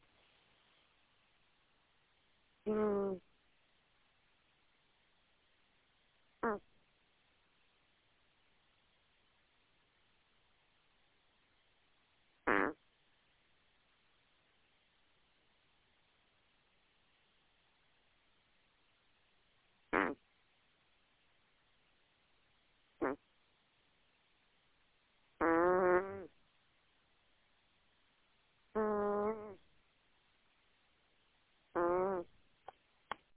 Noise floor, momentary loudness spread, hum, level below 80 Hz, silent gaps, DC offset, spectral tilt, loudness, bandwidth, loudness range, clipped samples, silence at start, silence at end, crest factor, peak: -75 dBFS; 18 LU; none; -74 dBFS; none; under 0.1%; -5 dB/octave; -37 LUFS; 4 kHz; 12 LU; under 0.1%; 2.65 s; 1.15 s; 28 dB; -16 dBFS